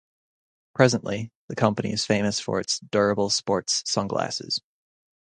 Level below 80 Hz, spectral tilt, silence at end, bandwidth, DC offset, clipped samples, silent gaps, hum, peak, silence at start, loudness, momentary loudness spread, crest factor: -58 dBFS; -4 dB/octave; 0.65 s; 9.8 kHz; under 0.1%; under 0.1%; 1.35-1.48 s; none; 0 dBFS; 0.75 s; -24 LUFS; 9 LU; 24 dB